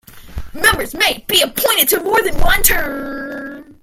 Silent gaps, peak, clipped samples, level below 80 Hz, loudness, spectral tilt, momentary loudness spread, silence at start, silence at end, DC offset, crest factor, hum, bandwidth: none; 0 dBFS; under 0.1%; -26 dBFS; -14 LUFS; -1.5 dB/octave; 18 LU; 0.15 s; 0.1 s; under 0.1%; 16 dB; none; 17 kHz